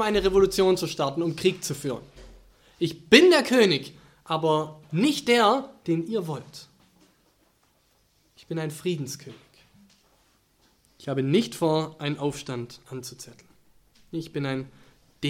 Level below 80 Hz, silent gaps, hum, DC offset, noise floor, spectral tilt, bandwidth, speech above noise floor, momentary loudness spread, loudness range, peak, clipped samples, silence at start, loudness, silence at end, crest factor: -54 dBFS; none; none; under 0.1%; -66 dBFS; -5 dB/octave; 16.5 kHz; 41 dB; 19 LU; 15 LU; 0 dBFS; under 0.1%; 0 s; -24 LUFS; 0 s; 26 dB